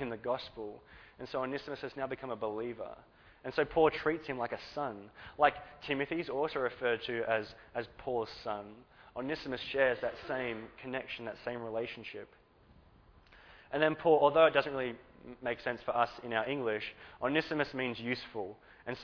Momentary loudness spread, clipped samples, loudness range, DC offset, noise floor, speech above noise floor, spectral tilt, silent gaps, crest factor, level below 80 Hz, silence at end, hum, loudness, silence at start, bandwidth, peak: 17 LU; under 0.1%; 8 LU; under 0.1%; -62 dBFS; 28 dB; -3 dB/octave; none; 24 dB; -64 dBFS; 0 s; none; -34 LUFS; 0 s; 5.4 kHz; -10 dBFS